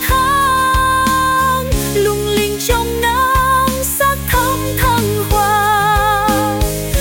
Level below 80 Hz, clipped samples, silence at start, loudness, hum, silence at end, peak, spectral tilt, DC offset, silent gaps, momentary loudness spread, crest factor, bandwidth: -24 dBFS; under 0.1%; 0 s; -14 LUFS; none; 0 s; -4 dBFS; -4 dB/octave; under 0.1%; none; 4 LU; 10 dB; 17 kHz